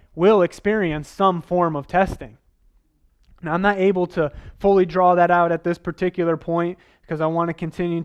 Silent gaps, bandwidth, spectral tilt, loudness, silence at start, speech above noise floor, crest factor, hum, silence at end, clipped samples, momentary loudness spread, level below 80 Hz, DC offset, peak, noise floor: none; 11 kHz; -7.5 dB/octave; -20 LUFS; 0.15 s; 40 dB; 18 dB; none; 0 s; under 0.1%; 10 LU; -46 dBFS; under 0.1%; -4 dBFS; -60 dBFS